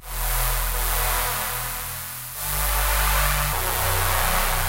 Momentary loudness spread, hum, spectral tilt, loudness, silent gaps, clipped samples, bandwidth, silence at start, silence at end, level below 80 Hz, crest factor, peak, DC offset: 8 LU; none; -2 dB/octave; -23 LUFS; none; under 0.1%; 16 kHz; 0 s; 0 s; -28 dBFS; 16 dB; -6 dBFS; 0.1%